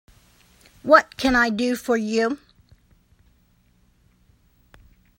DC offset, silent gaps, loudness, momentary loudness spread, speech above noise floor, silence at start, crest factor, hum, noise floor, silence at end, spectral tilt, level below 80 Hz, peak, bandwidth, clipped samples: under 0.1%; none; -20 LUFS; 11 LU; 41 dB; 0.85 s; 24 dB; none; -61 dBFS; 2.8 s; -4 dB/octave; -50 dBFS; 0 dBFS; 16 kHz; under 0.1%